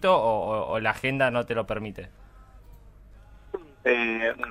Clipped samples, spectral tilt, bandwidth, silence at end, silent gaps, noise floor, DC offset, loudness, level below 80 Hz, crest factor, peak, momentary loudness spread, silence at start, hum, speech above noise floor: under 0.1%; -6 dB/octave; 15 kHz; 0 s; none; -50 dBFS; under 0.1%; -26 LUFS; -52 dBFS; 20 dB; -8 dBFS; 17 LU; 0 s; none; 24 dB